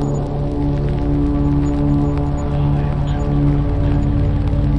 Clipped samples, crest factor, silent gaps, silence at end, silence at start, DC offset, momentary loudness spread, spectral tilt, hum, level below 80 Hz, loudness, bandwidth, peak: under 0.1%; 12 dB; none; 0 s; 0 s; under 0.1%; 3 LU; -9.5 dB/octave; none; -22 dBFS; -18 LUFS; 7.4 kHz; -4 dBFS